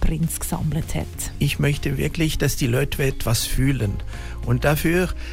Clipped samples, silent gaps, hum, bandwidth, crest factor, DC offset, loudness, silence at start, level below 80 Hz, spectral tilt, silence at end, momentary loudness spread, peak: under 0.1%; none; none; 16.5 kHz; 14 dB; under 0.1%; -23 LUFS; 0 s; -28 dBFS; -5 dB/octave; 0 s; 8 LU; -8 dBFS